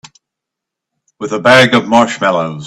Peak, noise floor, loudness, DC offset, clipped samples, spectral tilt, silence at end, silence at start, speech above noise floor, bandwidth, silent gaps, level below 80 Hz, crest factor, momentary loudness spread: 0 dBFS; -81 dBFS; -10 LUFS; under 0.1%; 0.2%; -4.5 dB/octave; 0 s; 1.2 s; 70 dB; 13.5 kHz; none; -52 dBFS; 14 dB; 12 LU